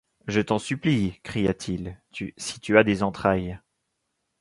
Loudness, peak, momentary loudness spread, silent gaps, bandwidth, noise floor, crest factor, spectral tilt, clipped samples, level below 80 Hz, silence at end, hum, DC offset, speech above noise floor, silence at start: -25 LUFS; -2 dBFS; 16 LU; none; 11.5 kHz; -78 dBFS; 24 dB; -5.5 dB/octave; under 0.1%; -50 dBFS; 0.85 s; none; under 0.1%; 53 dB; 0.25 s